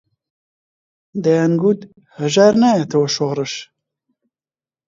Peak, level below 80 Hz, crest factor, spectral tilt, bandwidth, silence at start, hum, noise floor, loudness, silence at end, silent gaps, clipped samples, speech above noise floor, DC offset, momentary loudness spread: 0 dBFS; -62 dBFS; 18 dB; -5.5 dB/octave; 7.8 kHz; 1.15 s; none; under -90 dBFS; -16 LUFS; 1.25 s; none; under 0.1%; over 74 dB; under 0.1%; 13 LU